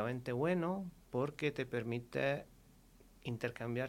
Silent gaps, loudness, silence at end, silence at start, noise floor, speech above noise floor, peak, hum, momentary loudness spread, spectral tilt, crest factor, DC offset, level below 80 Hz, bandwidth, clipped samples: none; -39 LUFS; 0 s; 0 s; -63 dBFS; 25 dB; -20 dBFS; none; 8 LU; -7 dB/octave; 18 dB; under 0.1%; -66 dBFS; 16.5 kHz; under 0.1%